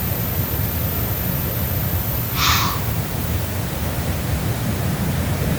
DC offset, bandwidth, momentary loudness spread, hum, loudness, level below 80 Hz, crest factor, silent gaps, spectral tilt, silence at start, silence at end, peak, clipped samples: under 0.1%; over 20 kHz; 5 LU; none; -21 LUFS; -30 dBFS; 18 dB; none; -4.5 dB/octave; 0 s; 0 s; -2 dBFS; under 0.1%